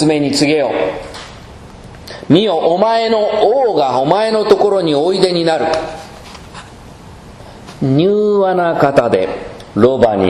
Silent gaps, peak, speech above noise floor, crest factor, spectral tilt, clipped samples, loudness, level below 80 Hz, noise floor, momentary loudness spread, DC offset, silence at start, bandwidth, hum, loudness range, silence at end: none; 0 dBFS; 23 dB; 14 dB; -6 dB/octave; 0.1%; -13 LUFS; -44 dBFS; -35 dBFS; 21 LU; under 0.1%; 0 s; 12.5 kHz; none; 5 LU; 0 s